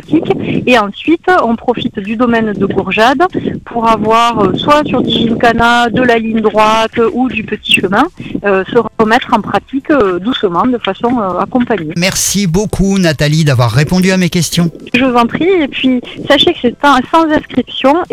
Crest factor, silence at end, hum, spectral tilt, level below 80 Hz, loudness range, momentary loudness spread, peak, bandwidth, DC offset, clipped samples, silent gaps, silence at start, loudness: 10 dB; 0.1 s; none; -5 dB/octave; -36 dBFS; 2 LU; 6 LU; 0 dBFS; 17 kHz; under 0.1%; 0.2%; none; 0.1 s; -11 LUFS